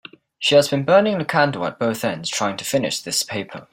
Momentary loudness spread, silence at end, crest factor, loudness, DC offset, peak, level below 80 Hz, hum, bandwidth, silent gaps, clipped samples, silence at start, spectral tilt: 7 LU; 0.1 s; 18 dB; -20 LUFS; under 0.1%; -2 dBFS; -62 dBFS; none; 16.5 kHz; none; under 0.1%; 0.4 s; -3.5 dB/octave